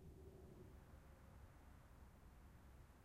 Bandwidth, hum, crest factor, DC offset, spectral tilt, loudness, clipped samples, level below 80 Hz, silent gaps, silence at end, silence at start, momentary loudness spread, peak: 15.5 kHz; none; 12 dB; under 0.1%; -6.5 dB/octave; -65 LUFS; under 0.1%; -66 dBFS; none; 0 s; 0 s; 4 LU; -50 dBFS